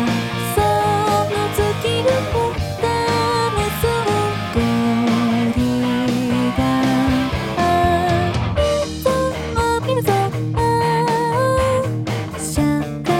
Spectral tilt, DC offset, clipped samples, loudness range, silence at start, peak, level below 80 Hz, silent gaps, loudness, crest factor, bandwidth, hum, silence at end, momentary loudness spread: -5.5 dB/octave; under 0.1%; under 0.1%; 1 LU; 0 s; -4 dBFS; -34 dBFS; none; -18 LUFS; 14 dB; 17.5 kHz; none; 0 s; 4 LU